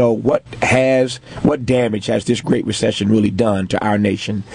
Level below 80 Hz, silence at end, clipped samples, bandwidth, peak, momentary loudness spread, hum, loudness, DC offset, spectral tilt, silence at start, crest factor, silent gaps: -46 dBFS; 0 s; under 0.1%; 10.5 kHz; -2 dBFS; 4 LU; none; -17 LUFS; under 0.1%; -6 dB/octave; 0 s; 14 dB; none